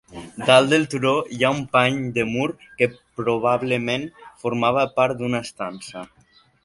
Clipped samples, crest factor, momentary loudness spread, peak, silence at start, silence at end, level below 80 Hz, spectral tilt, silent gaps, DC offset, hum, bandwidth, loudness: under 0.1%; 22 dB; 15 LU; 0 dBFS; 0.1 s; 0.6 s; -58 dBFS; -5 dB/octave; none; under 0.1%; none; 11.5 kHz; -21 LUFS